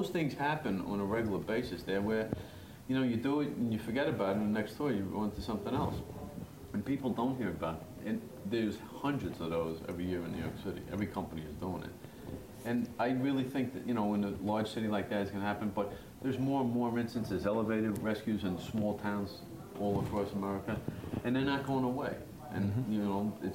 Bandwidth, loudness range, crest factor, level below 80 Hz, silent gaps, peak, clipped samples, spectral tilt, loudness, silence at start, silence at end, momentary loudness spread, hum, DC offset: 16 kHz; 3 LU; 16 dB; -58 dBFS; none; -18 dBFS; under 0.1%; -7 dB/octave; -36 LUFS; 0 s; 0 s; 9 LU; none; under 0.1%